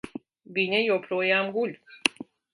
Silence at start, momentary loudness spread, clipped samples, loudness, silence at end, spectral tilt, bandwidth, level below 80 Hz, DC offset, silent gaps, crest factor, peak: 0.05 s; 17 LU; under 0.1%; -26 LUFS; 0.3 s; -3.5 dB/octave; 11.5 kHz; -72 dBFS; under 0.1%; none; 26 dB; -2 dBFS